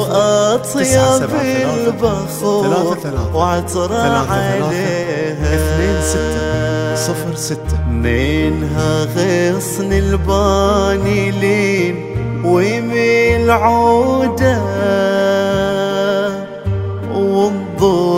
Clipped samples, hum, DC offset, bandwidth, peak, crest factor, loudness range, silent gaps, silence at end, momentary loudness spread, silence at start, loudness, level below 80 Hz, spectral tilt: under 0.1%; none; under 0.1%; 16 kHz; 0 dBFS; 14 dB; 3 LU; none; 0 s; 7 LU; 0 s; -15 LUFS; -28 dBFS; -5.5 dB/octave